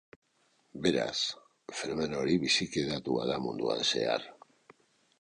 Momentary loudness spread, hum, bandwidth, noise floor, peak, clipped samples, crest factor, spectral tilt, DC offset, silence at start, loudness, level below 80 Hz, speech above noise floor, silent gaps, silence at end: 12 LU; none; 11 kHz; -71 dBFS; -12 dBFS; under 0.1%; 20 dB; -4 dB/octave; under 0.1%; 0.75 s; -31 LUFS; -64 dBFS; 40 dB; none; 0.9 s